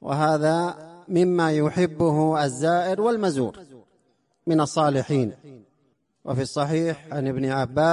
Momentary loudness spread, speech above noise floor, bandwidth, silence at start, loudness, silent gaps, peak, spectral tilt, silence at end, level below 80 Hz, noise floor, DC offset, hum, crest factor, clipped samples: 9 LU; 46 dB; 11.5 kHz; 0.05 s; -23 LUFS; none; -8 dBFS; -6.5 dB/octave; 0 s; -58 dBFS; -68 dBFS; under 0.1%; none; 16 dB; under 0.1%